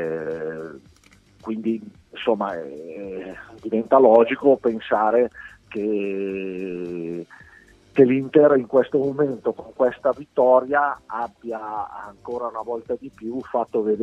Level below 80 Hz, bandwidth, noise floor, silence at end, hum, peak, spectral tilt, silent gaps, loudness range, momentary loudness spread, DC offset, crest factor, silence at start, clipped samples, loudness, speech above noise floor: -62 dBFS; 7.2 kHz; -54 dBFS; 0 s; none; -2 dBFS; -8 dB/octave; none; 8 LU; 18 LU; under 0.1%; 20 dB; 0 s; under 0.1%; -22 LUFS; 34 dB